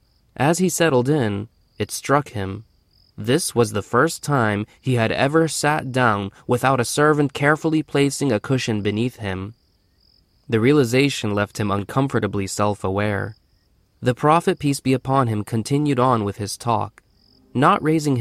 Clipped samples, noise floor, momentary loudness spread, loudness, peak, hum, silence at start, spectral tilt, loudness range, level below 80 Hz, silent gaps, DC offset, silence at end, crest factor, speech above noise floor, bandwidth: under 0.1%; -61 dBFS; 10 LU; -20 LUFS; -2 dBFS; none; 0.4 s; -5.5 dB/octave; 3 LU; -54 dBFS; none; under 0.1%; 0 s; 18 dB; 41 dB; 15.5 kHz